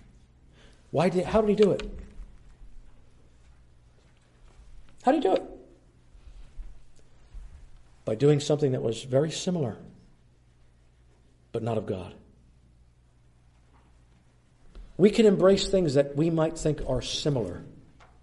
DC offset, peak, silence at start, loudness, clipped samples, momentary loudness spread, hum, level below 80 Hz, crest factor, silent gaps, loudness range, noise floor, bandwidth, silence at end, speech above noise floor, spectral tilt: under 0.1%; -8 dBFS; 0.95 s; -26 LUFS; under 0.1%; 17 LU; none; -48 dBFS; 22 dB; none; 14 LU; -60 dBFS; 11.5 kHz; 0.5 s; 35 dB; -6 dB/octave